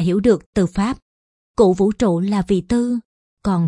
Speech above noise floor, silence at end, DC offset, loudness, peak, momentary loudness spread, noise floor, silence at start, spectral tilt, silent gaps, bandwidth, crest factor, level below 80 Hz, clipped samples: over 73 dB; 0 s; under 0.1%; -18 LUFS; -2 dBFS; 11 LU; under -90 dBFS; 0 s; -7.5 dB/octave; 0.46-0.53 s, 1.02-1.54 s, 3.05-3.37 s; 11 kHz; 16 dB; -40 dBFS; under 0.1%